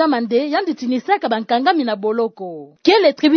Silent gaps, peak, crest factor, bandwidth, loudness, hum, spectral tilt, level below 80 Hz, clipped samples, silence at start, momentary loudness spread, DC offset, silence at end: none; -2 dBFS; 16 dB; 6.6 kHz; -17 LUFS; none; -5 dB/octave; -70 dBFS; under 0.1%; 0 s; 9 LU; under 0.1%; 0 s